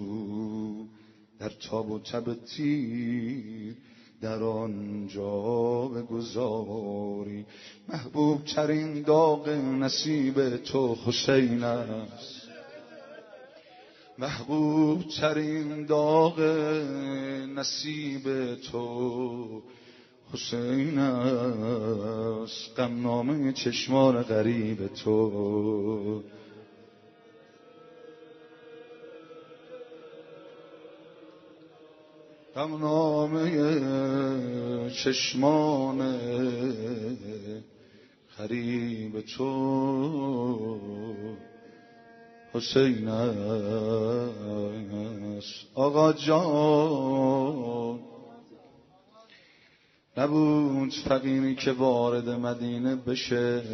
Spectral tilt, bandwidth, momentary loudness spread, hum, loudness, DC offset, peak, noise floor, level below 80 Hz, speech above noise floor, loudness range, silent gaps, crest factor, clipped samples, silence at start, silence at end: -5.5 dB/octave; 6.2 kHz; 18 LU; none; -28 LUFS; under 0.1%; -8 dBFS; -63 dBFS; -66 dBFS; 35 dB; 7 LU; none; 20 dB; under 0.1%; 0 s; 0 s